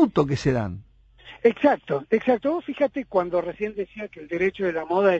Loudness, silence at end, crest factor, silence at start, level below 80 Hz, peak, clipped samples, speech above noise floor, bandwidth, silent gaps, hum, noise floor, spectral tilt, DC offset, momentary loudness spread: -24 LUFS; 0 s; 18 dB; 0 s; -52 dBFS; -4 dBFS; under 0.1%; 25 dB; 8.2 kHz; none; none; -48 dBFS; -7.5 dB/octave; under 0.1%; 11 LU